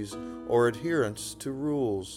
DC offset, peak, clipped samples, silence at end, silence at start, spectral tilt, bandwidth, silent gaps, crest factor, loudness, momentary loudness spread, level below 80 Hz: under 0.1%; -14 dBFS; under 0.1%; 0 s; 0 s; -5.5 dB/octave; 16 kHz; none; 16 dB; -29 LUFS; 11 LU; -58 dBFS